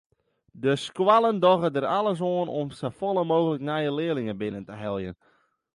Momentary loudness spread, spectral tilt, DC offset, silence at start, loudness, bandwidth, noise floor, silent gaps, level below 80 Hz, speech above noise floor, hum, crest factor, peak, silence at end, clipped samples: 12 LU; -6.5 dB/octave; under 0.1%; 0.55 s; -25 LUFS; 11.5 kHz; -67 dBFS; none; -62 dBFS; 43 dB; none; 20 dB; -6 dBFS; 0.6 s; under 0.1%